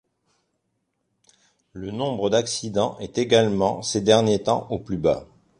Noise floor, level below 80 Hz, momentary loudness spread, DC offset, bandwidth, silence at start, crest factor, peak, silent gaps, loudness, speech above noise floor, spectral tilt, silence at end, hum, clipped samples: -75 dBFS; -52 dBFS; 10 LU; under 0.1%; 11.5 kHz; 1.75 s; 20 dB; -4 dBFS; none; -22 LUFS; 53 dB; -4.5 dB/octave; 0.35 s; none; under 0.1%